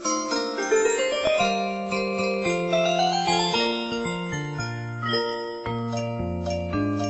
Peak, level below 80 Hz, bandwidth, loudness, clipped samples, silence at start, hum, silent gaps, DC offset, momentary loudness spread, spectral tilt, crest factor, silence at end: -10 dBFS; -50 dBFS; 8.4 kHz; -25 LUFS; under 0.1%; 0 s; none; none; under 0.1%; 8 LU; -4 dB/octave; 14 dB; 0 s